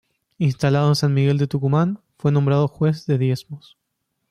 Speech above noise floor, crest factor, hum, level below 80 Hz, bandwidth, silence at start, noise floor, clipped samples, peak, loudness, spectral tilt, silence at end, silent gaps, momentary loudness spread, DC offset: 56 dB; 12 dB; none; -56 dBFS; 11 kHz; 0.4 s; -75 dBFS; under 0.1%; -8 dBFS; -20 LUFS; -7.5 dB/octave; 0.7 s; none; 7 LU; under 0.1%